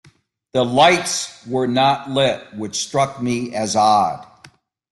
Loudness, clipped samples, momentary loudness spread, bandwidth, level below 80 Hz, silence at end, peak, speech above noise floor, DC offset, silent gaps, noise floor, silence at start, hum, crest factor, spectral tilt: -18 LUFS; under 0.1%; 11 LU; 12.5 kHz; -58 dBFS; 0.7 s; -2 dBFS; 36 dB; under 0.1%; none; -54 dBFS; 0.55 s; none; 18 dB; -3.5 dB/octave